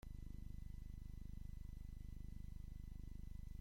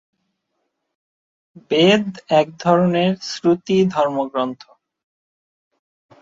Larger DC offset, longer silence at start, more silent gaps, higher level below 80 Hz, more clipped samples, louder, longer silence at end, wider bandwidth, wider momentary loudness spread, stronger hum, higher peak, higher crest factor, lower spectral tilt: neither; second, 0.05 s vs 1.55 s; neither; first, -52 dBFS vs -62 dBFS; neither; second, -56 LUFS vs -18 LUFS; second, 0 s vs 1.65 s; first, 16.5 kHz vs 7.8 kHz; second, 1 LU vs 8 LU; first, 50 Hz at -55 dBFS vs none; second, -38 dBFS vs -2 dBFS; second, 12 dB vs 18 dB; about the same, -7 dB/octave vs -6 dB/octave